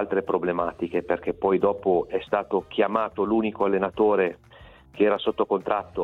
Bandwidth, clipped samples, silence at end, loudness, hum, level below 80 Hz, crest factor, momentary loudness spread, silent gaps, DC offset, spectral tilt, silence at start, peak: 4.2 kHz; under 0.1%; 0 s; -25 LUFS; none; -56 dBFS; 16 dB; 5 LU; none; under 0.1%; -8 dB/octave; 0 s; -8 dBFS